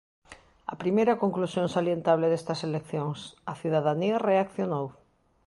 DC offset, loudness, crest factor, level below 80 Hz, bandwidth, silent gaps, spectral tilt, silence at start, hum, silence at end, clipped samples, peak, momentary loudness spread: under 0.1%; -27 LUFS; 18 dB; -68 dBFS; 11.5 kHz; none; -7 dB/octave; 0.3 s; none; 0.55 s; under 0.1%; -10 dBFS; 12 LU